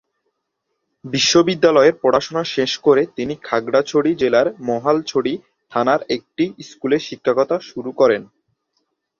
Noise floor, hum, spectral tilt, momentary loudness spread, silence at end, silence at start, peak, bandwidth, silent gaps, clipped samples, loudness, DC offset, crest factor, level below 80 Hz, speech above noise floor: -75 dBFS; none; -4 dB/octave; 11 LU; 0.95 s; 1.05 s; -2 dBFS; 7.4 kHz; none; under 0.1%; -18 LUFS; under 0.1%; 18 dB; -60 dBFS; 58 dB